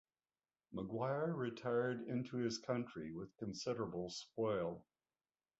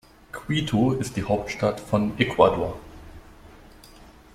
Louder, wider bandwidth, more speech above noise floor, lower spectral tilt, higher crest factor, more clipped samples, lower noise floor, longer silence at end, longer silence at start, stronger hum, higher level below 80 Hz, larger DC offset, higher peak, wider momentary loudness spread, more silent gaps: second, -42 LUFS vs -24 LUFS; second, 7.6 kHz vs 15.5 kHz; first, over 48 dB vs 26 dB; about the same, -5.5 dB/octave vs -6 dB/octave; about the same, 18 dB vs 22 dB; neither; first, under -90 dBFS vs -49 dBFS; about the same, 0.8 s vs 0.85 s; first, 0.7 s vs 0.35 s; neither; second, -74 dBFS vs -46 dBFS; neither; second, -26 dBFS vs -4 dBFS; second, 9 LU vs 20 LU; neither